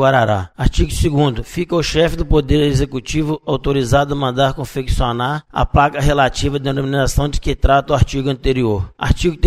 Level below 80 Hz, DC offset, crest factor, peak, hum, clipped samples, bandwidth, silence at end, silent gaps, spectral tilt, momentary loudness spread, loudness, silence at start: -24 dBFS; under 0.1%; 14 dB; 0 dBFS; none; under 0.1%; 15 kHz; 0 s; none; -6 dB/octave; 6 LU; -17 LUFS; 0 s